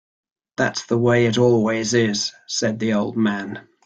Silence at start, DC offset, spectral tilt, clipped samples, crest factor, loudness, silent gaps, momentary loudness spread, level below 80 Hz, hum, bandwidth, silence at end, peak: 0.6 s; under 0.1%; -5 dB/octave; under 0.1%; 16 dB; -20 LUFS; none; 7 LU; -58 dBFS; none; 9 kHz; 0.25 s; -4 dBFS